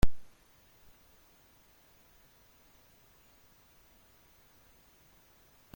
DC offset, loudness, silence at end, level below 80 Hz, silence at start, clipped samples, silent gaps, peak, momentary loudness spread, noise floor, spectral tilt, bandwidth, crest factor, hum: under 0.1%; -54 LUFS; 5.55 s; -46 dBFS; 0.05 s; under 0.1%; none; -10 dBFS; 0 LU; -63 dBFS; -6 dB/octave; 16.5 kHz; 24 dB; none